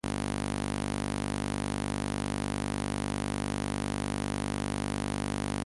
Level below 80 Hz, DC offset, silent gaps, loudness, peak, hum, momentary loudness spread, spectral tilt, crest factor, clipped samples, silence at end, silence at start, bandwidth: -44 dBFS; under 0.1%; none; -33 LUFS; -18 dBFS; 50 Hz at -60 dBFS; 0 LU; -5 dB/octave; 16 dB; under 0.1%; 0 s; 0.05 s; 11.5 kHz